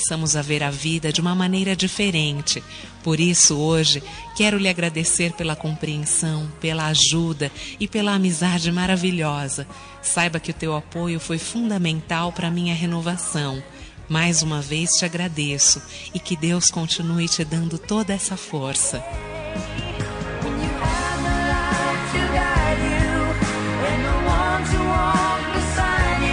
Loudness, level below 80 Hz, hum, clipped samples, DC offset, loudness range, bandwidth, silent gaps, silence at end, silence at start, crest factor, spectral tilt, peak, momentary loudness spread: -21 LUFS; -34 dBFS; none; under 0.1%; under 0.1%; 5 LU; 10.5 kHz; none; 0 s; 0 s; 18 dB; -3.5 dB/octave; -4 dBFS; 10 LU